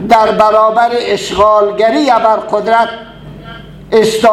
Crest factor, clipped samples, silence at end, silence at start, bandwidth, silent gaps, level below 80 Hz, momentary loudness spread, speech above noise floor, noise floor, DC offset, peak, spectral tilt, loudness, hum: 10 dB; 0.3%; 0 s; 0 s; 13.5 kHz; none; -40 dBFS; 20 LU; 21 dB; -30 dBFS; under 0.1%; 0 dBFS; -4.5 dB/octave; -10 LUFS; none